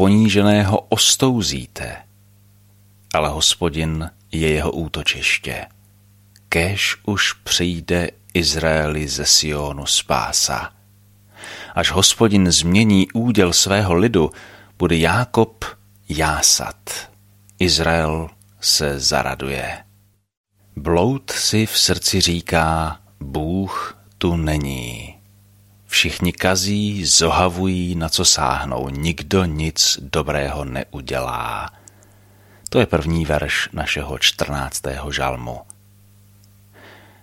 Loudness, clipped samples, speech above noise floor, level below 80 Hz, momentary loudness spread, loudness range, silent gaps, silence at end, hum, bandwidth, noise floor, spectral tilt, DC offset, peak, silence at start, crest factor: -18 LUFS; under 0.1%; 37 dB; -36 dBFS; 15 LU; 6 LU; 20.37-20.44 s; 0.3 s; 50 Hz at -45 dBFS; 16.5 kHz; -56 dBFS; -3.5 dB/octave; under 0.1%; 0 dBFS; 0 s; 20 dB